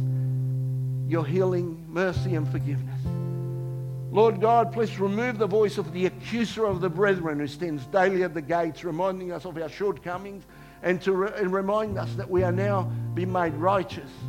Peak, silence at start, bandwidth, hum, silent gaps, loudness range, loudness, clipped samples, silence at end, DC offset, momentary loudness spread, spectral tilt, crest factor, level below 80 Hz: -8 dBFS; 0 s; 15.5 kHz; none; none; 4 LU; -26 LUFS; under 0.1%; 0 s; under 0.1%; 10 LU; -7.5 dB/octave; 18 dB; -52 dBFS